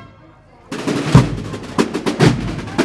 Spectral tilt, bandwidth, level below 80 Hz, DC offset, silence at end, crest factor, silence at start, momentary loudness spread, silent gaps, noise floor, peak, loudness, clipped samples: -6.5 dB/octave; 12.5 kHz; -34 dBFS; under 0.1%; 0 s; 18 dB; 0 s; 12 LU; none; -45 dBFS; 0 dBFS; -17 LUFS; 0.2%